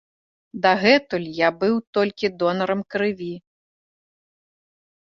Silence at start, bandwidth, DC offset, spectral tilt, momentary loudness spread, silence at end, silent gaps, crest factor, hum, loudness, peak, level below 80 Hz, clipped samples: 0.55 s; 7.4 kHz; under 0.1%; -6 dB/octave; 14 LU; 1.65 s; 1.87-1.93 s; 22 dB; none; -21 LUFS; -2 dBFS; -64 dBFS; under 0.1%